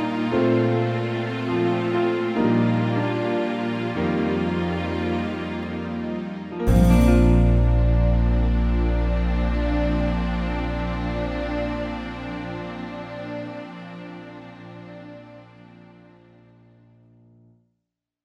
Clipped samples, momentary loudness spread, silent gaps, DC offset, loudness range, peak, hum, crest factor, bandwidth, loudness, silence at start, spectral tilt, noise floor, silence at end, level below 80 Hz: under 0.1%; 18 LU; none; under 0.1%; 17 LU; -6 dBFS; none; 16 dB; 10.5 kHz; -23 LUFS; 0 s; -8 dB/octave; -81 dBFS; 2.8 s; -28 dBFS